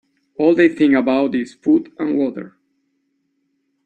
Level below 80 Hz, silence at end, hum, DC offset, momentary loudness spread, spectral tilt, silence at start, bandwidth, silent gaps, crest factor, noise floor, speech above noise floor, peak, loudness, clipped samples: -62 dBFS; 1.35 s; none; under 0.1%; 9 LU; -7 dB/octave; 0.4 s; 8.6 kHz; none; 16 dB; -68 dBFS; 52 dB; -2 dBFS; -17 LUFS; under 0.1%